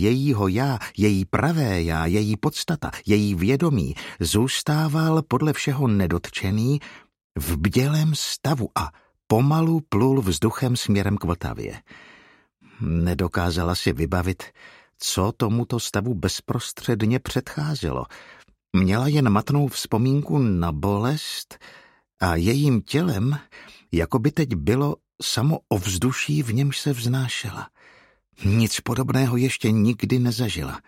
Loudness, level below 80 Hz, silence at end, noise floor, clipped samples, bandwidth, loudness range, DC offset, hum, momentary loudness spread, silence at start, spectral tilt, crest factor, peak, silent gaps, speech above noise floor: -23 LUFS; -42 dBFS; 0.1 s; -56 dBFS; under 0.1%; 16.5 kHz; 3 LU; under 0.1%; none; 8 LU; 0 s; -5.5 dB/octave; 20 dB; -2 dBFS; 7.24-7.30 s; 34 dB